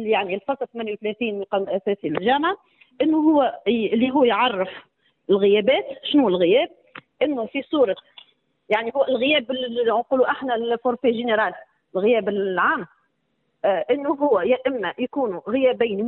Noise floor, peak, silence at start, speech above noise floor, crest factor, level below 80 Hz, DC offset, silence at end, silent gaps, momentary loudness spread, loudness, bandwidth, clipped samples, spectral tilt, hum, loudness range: -71 dBFS; -6 dBFS; 0 s; 51 dB; 16 dB; -66 dBFS; under 0.1%; 0 s; none; 9 LU; -21 LUFS; 4.2 kHz; under 0.1%; -8.5 dB/octave; none; 3 LU